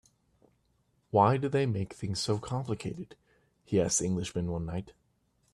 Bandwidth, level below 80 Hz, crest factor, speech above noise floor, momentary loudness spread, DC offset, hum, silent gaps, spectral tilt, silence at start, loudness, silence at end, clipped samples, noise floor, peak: 13 kHz; -58 dBFS; 22 dB; 42 dB; 13 LU; under 0.1%; none; none; -5 dB/octave; 1.15 s; -31 LUFS; 0.6 s; under 0.1%; -72 dBFS; -10 dBFS